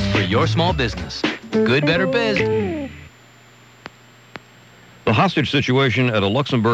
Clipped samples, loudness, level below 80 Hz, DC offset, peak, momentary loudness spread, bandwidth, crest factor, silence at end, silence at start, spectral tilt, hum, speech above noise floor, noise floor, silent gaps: under 0.1%; -18 LUFS; -40 dBFS; under 0.1%; -6 dBFS; 13 LU; 8.6 kHz; 14 dB; 0 s; 0 s; -6 dB/octave; none; 30 dB; -47 dBFS; none